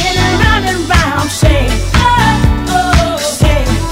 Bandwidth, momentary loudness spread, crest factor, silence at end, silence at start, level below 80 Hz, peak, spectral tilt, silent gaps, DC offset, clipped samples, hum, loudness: 16.5 kHz; 4 LU; 10 dB; 0 s; 0 s; -16 dBFS; 0 dBFS; -4.5 dB/octave; none; under 0.1%; 0.3%; none; -11 LUFS